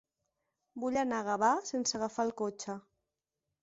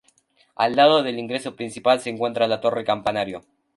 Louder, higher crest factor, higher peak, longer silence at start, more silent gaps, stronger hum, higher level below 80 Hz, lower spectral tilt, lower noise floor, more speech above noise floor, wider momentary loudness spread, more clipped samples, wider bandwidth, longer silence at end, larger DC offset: second, -33 LUFS vs -22 LUFS; about the same, 20 dB vs 20 dB; second, -16 dBFS vs -4 dBFS; first, 0.75 s vs 0.6 s; neither; neither; second, -74 dBFS vs -62 dBFS; second, -3 dB/octave vs -4.5 dB/octave; first, -89 dBFS vs -61 dBFS; first, 55 dB vs 40 dB; about the same, 13 LU vs 12 LU; neither; second, 8 kHz vs 11.5 kHz; first, 0.8 s vs 0.35 s; neither